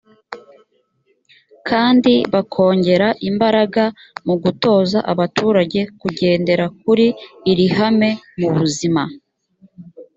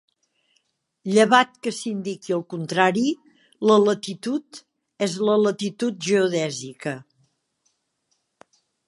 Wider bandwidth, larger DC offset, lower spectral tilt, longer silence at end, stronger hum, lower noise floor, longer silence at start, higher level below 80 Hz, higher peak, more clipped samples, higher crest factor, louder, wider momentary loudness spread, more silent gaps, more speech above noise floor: second, 8 kHz vs 11.5 kHz; neither; first, -6 dB/octave vs -4.5 dB/octave; second, 0.15 s vs 1.85 s; neither; second, -63 dBFS vs -73 dBFS; second, 0.3 s vs 1.05 s; first, -56 dBFS vs -76 dBFS; about the same, -2 dBFS vs -2 dBFS; neither; second, 16 dB vs 22 dB; first, -16 LUFS vs -22 LUFS; second, 9 LU vs 14 LU; neither; second, 47 dB vs 51 dB